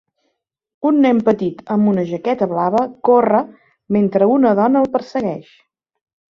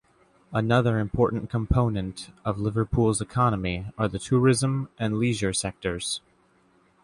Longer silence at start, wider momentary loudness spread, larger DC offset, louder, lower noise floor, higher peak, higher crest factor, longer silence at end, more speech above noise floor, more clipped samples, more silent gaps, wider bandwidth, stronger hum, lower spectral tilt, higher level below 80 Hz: first, 0.8 s vs 0.5 s; about the same, 9 LU vs 9 LU; neither; first, -16 LUFS vs -26 LUFS; first, -71 dBFS vs -62 dBFS; first, -2 dBFS vs -8 dBFS; about the same, 14 dB vs 18 dB; about the same, 0.9 s vs 0.85 s; first, 56 dB vs 38 dB; neither; neither; second, 6.8 kHz vs 11.5 kHz; neither; first, -9 dB/octave vs -5.5 dB/octave; second, -58 dBFS vs -42 dBFS